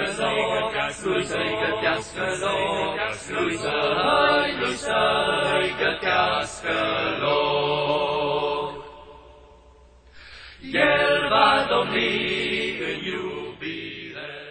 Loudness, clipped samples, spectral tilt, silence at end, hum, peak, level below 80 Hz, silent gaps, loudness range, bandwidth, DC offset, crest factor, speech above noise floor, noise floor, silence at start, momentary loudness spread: -23 LUFS; under 0.1%; -3.5 dB/octave; 0 s; none; -4 dBFS; -52 dBFS; none; 4 LU; 9.2 kHz; under 0.1%; 20 dB; 28 dB; -51 dBFS; 0 s; 13 LU